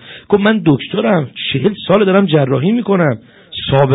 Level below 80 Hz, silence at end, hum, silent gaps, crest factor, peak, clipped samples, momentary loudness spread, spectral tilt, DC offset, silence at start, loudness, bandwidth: -46 dBFS; 0 s; none; none; 12 dB; 0 dBFS; under 0.1%; 7 LU; -10 dB/octave; under 0.1%; 0.05 s; -14 LUFS; 4 kHz